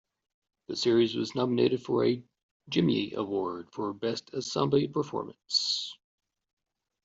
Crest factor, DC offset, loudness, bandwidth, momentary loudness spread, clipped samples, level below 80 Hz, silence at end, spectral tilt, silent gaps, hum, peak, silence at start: 20 dB; under 0.1%; -29 LUFS; 8 kHz; 10 LU; under 0.1%; -70 dBFS; 1.1 s; -5 dB/octave; 2.43-2.60 s; none; -10 dBFS; 0.7 s